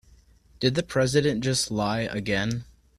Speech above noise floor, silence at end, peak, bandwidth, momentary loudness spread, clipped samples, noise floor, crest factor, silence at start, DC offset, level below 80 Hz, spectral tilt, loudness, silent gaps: 31 dB; 0.35 s; -8 dBFS; 14 kHz; 5 LU; under 0.1%; -56 dBFS; 20 dB; 0.6 s; under 0.1%; -50 dBFS; -4.5 dB/octave; -25 LUFS; none